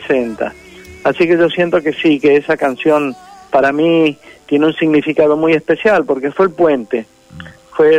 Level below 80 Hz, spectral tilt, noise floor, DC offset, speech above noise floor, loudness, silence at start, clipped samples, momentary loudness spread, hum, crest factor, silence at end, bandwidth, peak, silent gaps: -52 dBFS; -6.5 dB/octave; -35 dBFS; under 0.1%; 22 dB; -14 LUFS; 0 s; under 0.1%; 10 LU; none; 10 dB; 0 s; 10.5 kHz; -2 dBFS; none